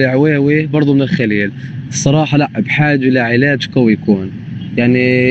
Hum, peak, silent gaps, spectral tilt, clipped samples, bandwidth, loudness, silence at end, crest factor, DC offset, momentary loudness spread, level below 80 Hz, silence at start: none; 0 dBFS; none; -6 dB/octave; under 0.1%; 8.4 kHz; -13 LUFS; 0 s; 12 dB; under 0.1%; 9 LU; -48 dBFS; 0 s